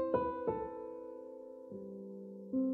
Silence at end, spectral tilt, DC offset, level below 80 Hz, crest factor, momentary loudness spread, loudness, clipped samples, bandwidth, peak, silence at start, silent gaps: 0 s; -10 dB/octave; under 0.1%; -66 dBFS; 18 dB; 14 LU; -42 LUFS; under 0.1%; 4.3 kHz; -20 dBFS; 0 s; none